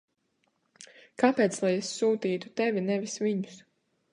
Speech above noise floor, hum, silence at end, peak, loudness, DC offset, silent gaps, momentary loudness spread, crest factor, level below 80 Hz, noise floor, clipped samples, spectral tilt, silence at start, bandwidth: 47 dB; none; 0.55 s; -8 dBFS; -28 LUFS; under 0.1%; none; 8 LU; 22 dB; -80 dBFS; -75 dBFS; under 0.1%; -5 dB/octave; 0.8 s; 11 kHz